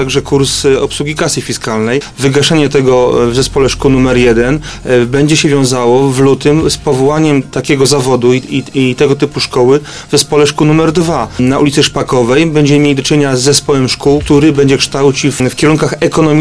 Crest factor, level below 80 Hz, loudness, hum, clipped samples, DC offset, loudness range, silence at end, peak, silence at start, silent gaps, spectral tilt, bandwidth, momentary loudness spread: 10 dB; -32 dBFS; -10 LUFS; none; 0.2%; 1%; 2 LU; 0 s; 0 dBFS; 0 s; none; -5 dB/octave; 11 kHz; 5 LU